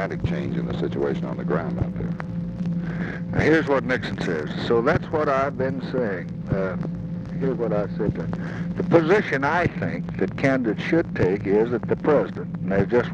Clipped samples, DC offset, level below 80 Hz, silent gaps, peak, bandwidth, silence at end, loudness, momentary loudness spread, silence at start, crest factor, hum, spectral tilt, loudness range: under 0.1%; under 0.1%; -44 dBFS; none; -4 dBFS; 7.8 kHz; 0 s; -24 LUFS; 9 LU; 0 s; 20 dB; none; -8 dB/octave; 4 LU